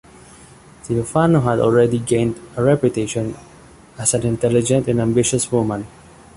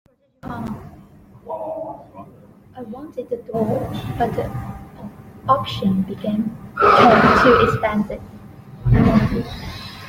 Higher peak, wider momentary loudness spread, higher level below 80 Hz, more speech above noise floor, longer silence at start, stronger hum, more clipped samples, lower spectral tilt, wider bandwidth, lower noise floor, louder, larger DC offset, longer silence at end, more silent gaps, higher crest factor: about the same, -2 dBFS vs -2 dBFS; second, 9 LU vs 23 LU; second, -46 dBFS vs -36 dBFS; about the same, 27 dB vs 28 dB; first, 0.85 s vs 0.45 s; neither; neither; second, -5.5 dB/octave vs -7 dB/octave; second, 11.5 kHz vs 16.5 kHz; about the same, -44 dBFS vs -45 dBFS; about the same, -18 LUFS vs -18 LUFS; neither; first, 0.5 s vs 0 s; neither; about the same, 16 dB vs 18 dB